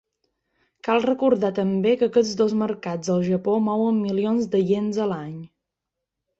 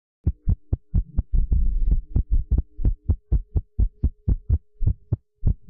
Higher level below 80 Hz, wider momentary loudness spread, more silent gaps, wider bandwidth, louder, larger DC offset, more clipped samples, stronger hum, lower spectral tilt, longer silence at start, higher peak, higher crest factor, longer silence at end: second, -64 dBFS vs -24 dBFS; first, 7 LU vs 3 LU; neither; first, 8 kHz vs 1.3 kHz; first, -22 LUFS vs -27 LUFS; neither; neither; neither; second, -6.5 dB/octave vs -14.5 dB/octave; first, 0.85 s vs 0.25 s; first, -6 dBFS vs -12 dBFS; first, 16 dB vs 10 dB; first, 0.95 s vs 0.15 s